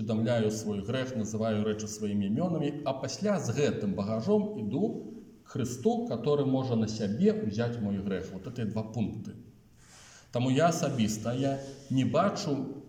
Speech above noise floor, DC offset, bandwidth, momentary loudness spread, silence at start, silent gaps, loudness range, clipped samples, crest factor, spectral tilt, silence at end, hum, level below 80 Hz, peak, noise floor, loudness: 26 dB; under 0.1%; 16 kHz; 9 LU; 0 s; none; 2 LU; under 0.1%; 16 dB; -6.5 dB/octave; 0 s; none; -64 dBFS; -14 dBFS; -56 dBFS; -31 LUFS